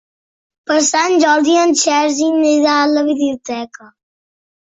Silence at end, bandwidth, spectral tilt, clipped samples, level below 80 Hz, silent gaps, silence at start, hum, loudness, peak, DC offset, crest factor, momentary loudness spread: 1 s; 8 kHz; -1 dB/octave; under 0.1%; -62 dBFS; none; 0.7 s; none; -13 LUFS; -2 dBFS; under 0.1%; 14 dB; 13 LU